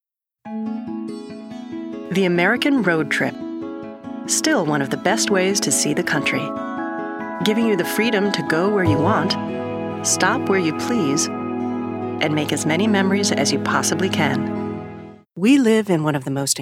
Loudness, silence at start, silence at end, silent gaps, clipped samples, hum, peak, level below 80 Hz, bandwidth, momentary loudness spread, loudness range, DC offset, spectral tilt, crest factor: -20 LUFS; 0.45 s; 0 s; none; under 0.1%; none; -2 dBFS; -62 dBFS; 16.5 kHz; 13 LU; 2 LU; under 0.1%; -4 dB/octave; 18 dB